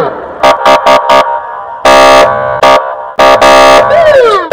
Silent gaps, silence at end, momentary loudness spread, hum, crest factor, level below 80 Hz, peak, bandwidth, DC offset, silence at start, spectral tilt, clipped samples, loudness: none; 0 s; 10 LU; none; 6 dB; -34 dBFS; 0 dBFS; over 20 kHz; under 0.1%; 0 s; -3 dB/octave; 10%; -4 LUFS